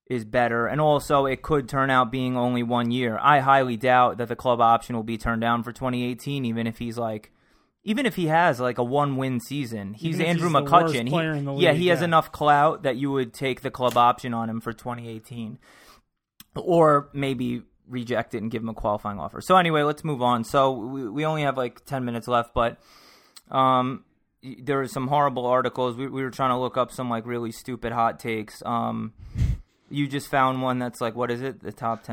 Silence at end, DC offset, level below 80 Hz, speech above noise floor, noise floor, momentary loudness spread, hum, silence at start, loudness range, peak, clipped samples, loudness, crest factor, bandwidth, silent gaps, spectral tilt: 0 s; under 0.1%; -46 dBFS; 35 dB; -59 dBFS; 12 LU; none; 0.1 s; 6 LU; -2 dBFS; under 0.1%; -24 LUFS; 22 dB; 17.5 kHz; none; -6 dB/octave